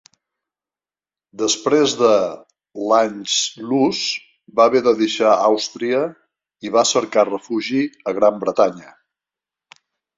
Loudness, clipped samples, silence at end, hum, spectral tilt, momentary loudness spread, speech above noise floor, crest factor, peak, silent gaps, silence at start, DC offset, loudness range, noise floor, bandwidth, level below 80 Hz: -18 LUFS; under 0.1%; 1.3 s; none; -3 dB/octave; 10 LU; over 73 dB; 18 dB; -2 dBFS; none; 1.4 s; under 0.1%; 2 LU; under -90 dBFS; 8 kHz; -64 dBFS